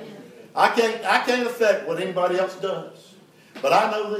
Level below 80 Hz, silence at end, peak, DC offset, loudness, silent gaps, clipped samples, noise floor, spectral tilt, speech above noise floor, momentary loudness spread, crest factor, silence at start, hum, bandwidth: -82 dBFS; 0 s; -2 dBFS; under 0.1%; -22 LUFS; none; under 0.1%; -45 dBFS; -3.5 dB/octave; 23 dB; 13 LU; 20 dB; 0 s; none; 16 kHz